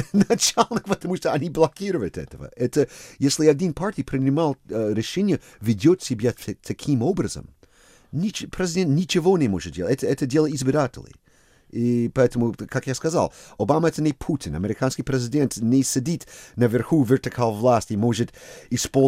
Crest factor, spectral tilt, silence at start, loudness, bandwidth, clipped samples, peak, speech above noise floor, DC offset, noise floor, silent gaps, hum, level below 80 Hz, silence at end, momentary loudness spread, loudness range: 20 dB; -5.5 dB/octave; 0 s; -23 LUFS; 16 kHz; under 0.1%; -2 dBFS; 35 dB; under 0.1%; -57 dBFS; none; none; -50 dBFS; 0 s; 9 LU; 2 LU